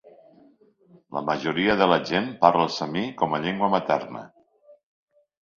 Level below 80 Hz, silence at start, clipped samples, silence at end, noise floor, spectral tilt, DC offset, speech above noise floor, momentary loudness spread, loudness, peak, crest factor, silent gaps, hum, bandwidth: -62 dBFS; 0.05 s; under 0.1%; 0.85 s; -57 dBFS; -6 dB/octave; under 0.1%; 34 dB; 11 LU; -23 LUFS; 0 dBFS; 26 dB; none; none; 7.4 kHz